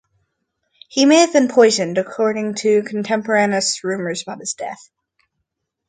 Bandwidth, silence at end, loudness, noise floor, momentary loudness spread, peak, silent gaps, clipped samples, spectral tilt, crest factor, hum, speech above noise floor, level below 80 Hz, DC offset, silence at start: 9.6 kHz; 1.15 s; -17 LUFS; -76 dBFS; 13 LU; 0 dBFS; none; under 0.1%; -3.5 dB/octave; 18 dB; none; 59 dB; -68 dBFS; under 0.1%; 0.95 s